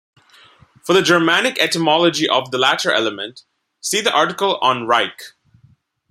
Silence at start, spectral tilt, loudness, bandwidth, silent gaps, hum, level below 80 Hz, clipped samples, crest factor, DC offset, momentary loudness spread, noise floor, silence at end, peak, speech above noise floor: 0.85 s; -3 dB/octave; -16 LUFS; 16 kHz; none; none; -66 dBFS; under 0.1%; 18 dB; under 0.1%; 13 LU; -55 dBFS; 0.8 s; 0 dBFS; 38 dB